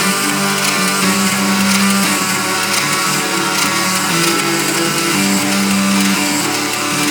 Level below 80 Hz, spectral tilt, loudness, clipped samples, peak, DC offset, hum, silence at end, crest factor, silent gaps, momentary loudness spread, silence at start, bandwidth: -64 dBFS; -2.5 dB/octave; -13 LUFS; under 0.1%; 0 dBFS; under 0.1%; none; 0 s; 14 dB; none; 2 LU; 0 s; over 20 kHz